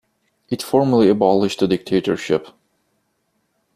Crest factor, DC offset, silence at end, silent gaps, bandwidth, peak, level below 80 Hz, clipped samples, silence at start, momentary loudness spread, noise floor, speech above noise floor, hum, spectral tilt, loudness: 16 dB; under 0.1%; 1.25 s; none; 14.5 kHz; -2 dBFS; -56 dBFS; under 0.1%; 0.5 s; 8 LU; -69 dBFS; 52 dB; none; -6.5 dB/octave; -18 LUFS